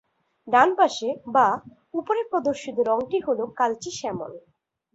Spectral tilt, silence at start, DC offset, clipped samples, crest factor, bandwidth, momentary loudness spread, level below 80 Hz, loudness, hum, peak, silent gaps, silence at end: -4 dB/octave; 0.45 s; under 0.1%; under 0.1%; 20 dB; 8 kHz; 13 LU; -66 dBFS; -24 LUFS; none; -4 dBFS; none; 0.55 s